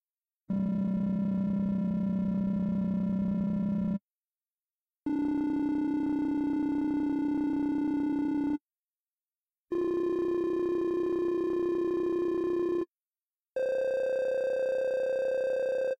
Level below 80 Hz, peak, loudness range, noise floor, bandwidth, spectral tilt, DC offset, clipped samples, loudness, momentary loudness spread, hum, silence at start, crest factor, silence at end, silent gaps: -60 dBFS; -22 dBFS; 2 LU; under -90 dBFS; 7.8 kHz; -9.5 dB/octave; under 0.1%; under 0.1%; -30 LUFS; 3 LU; none; 0.5 s; 8 dB; 0.05 s; none